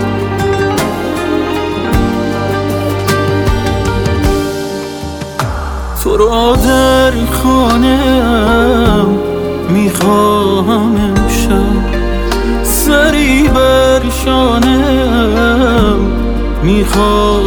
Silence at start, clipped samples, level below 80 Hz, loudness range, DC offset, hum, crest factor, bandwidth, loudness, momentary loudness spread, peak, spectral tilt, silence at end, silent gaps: 0 s; under 0.1%; -18 dBFS; 5 LU; under 0.1%; none; 10 dB; over 20 kHz; -11 LUFS; 7 LU; 0 dBFS; -5.5 dB/octave; 0 s; none